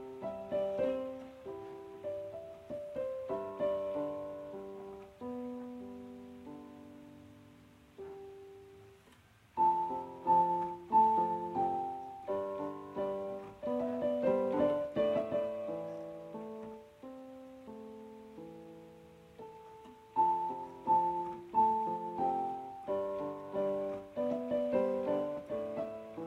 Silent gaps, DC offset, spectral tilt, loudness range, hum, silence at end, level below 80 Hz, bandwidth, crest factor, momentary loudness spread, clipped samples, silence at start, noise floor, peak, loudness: none; under 0.1%; -7.5 dB/octave; 16 LU; none; 0 s; -70 dBFS; 11.5 kHz; 18 dB; 21 LU; under 0.1%; 0 s; -63 dBFS; -18 dBFS; -35 LUFS